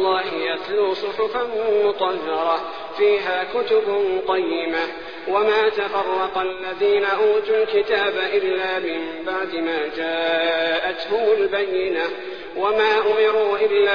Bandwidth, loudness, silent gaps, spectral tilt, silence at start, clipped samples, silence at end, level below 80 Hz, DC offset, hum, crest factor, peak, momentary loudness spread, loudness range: 5.2 kHz; -21 LUFS; none; -5 dB/octave; 0 s; under 0.1%; 0 s; -58 dBFS; 0.5%; none; 14 dB; -6 dBFS; 7 LU; 2 LU